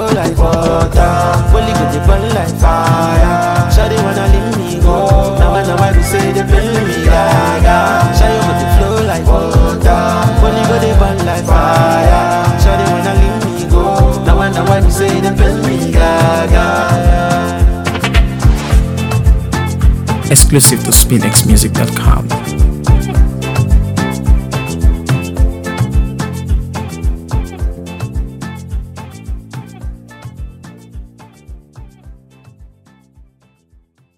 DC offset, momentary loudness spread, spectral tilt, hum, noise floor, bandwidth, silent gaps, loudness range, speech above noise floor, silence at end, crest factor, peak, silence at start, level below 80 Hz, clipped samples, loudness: under 0.1%; 12 LU; -5 dB/octave; none; -51 dBFS; 19 kHz; none; 12 LU; 42 dB; 1.5 s; 10 dB; 0 dBFS; 0 s; -14 dBFS; 0.3%; -11 LUFS